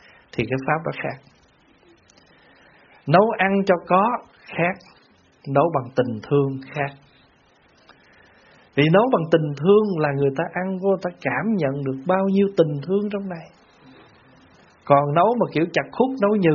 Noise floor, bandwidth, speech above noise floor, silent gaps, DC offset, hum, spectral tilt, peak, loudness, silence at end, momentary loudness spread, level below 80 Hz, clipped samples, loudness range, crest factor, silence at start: -57 dBFS; 7 kHz; 37 dB; none; under 0.1%; none; -6 dB/octave; 0 dBFS; -21 LUFS; 0 s; 12 LU; -62 dBFS; under 0.1%; 5 LU; 22 dB; 0.35 s